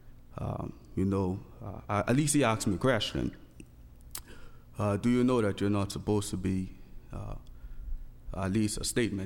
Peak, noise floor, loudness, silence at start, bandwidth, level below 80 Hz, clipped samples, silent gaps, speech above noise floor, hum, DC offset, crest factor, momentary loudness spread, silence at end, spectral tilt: -12 dBFS; -51 dBFS; -30 LUFS; 0.05 s; 18 kHz; -46 dBFS; under 0.1%; none; 22 dB; none; under 0.1%; 18 dB; 20 LU; 0 s; -5.5 dB/octave